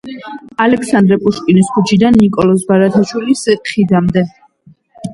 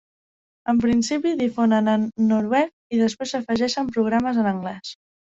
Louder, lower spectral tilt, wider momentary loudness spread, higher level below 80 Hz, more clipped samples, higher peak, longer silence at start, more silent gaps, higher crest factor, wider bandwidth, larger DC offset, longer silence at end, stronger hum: first, -12 LUFS vs -22 LUFS; about the same, -6.5 dB/octave vs -5.5 dB/octave; about the same, 11 LU vs 9 LU; first, -42 dBFS vs -56 dBFS; neither; first, 0 dBFS vs -6 dBFS; second, 0.05 s vs 0.65 s; second, none vs 2.73-2.90 s; about the same, 12 dB vs 16 dB; first, 11.5 kHz vs 7.8 kHz; neither; second, 0 s vs 0.45 s; neither